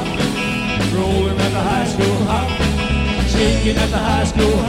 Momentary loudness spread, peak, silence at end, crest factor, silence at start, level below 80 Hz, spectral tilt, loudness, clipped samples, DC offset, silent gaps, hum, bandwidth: 3 LU; -2 dBFS; 0 s; 14 dB; 0 s; -24 dBFS; -5.5 dB/octave; -17 LUFS; under 0.1%; under 0.1%; none; none; 16 kHz